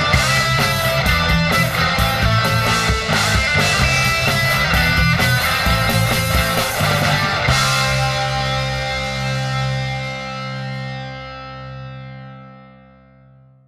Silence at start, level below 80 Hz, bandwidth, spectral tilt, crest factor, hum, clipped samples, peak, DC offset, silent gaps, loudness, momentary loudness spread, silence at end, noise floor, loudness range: 0 s; -30 dBFS; 14 kHz; -4 dB/octave; 18 dB; none; under 0.1%; 0 dBFS; under 0.1%; none; -16 LUFS; 14 LU; 1.05 s; -48 dBFS; 11 LU